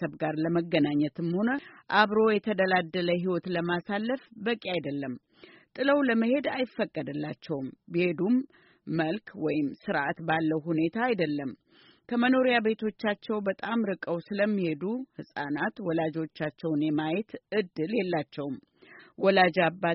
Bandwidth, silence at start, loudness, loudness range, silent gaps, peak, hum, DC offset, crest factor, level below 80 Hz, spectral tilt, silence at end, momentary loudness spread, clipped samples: 5.8 kHz; 0 s; -29 LUFS; 4 LU; none; -8 dBFS; none; under 0.1%; 20 dB; -70 dBFS; -4.5 dB/octave; 0 s; 11 LU; under 0.1%